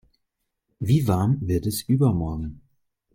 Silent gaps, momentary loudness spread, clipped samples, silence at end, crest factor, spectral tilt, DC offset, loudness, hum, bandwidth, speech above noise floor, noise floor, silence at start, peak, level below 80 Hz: none; 12 LU; under 0.1%; 0.55 s; 16 dB; -7.5 dB/octave; under 0.1%; -23 LUFS; none; 16.5 kHz; 56 dB; -78 dBFS; 0.8 s; -10 dBFS; -44 dBFS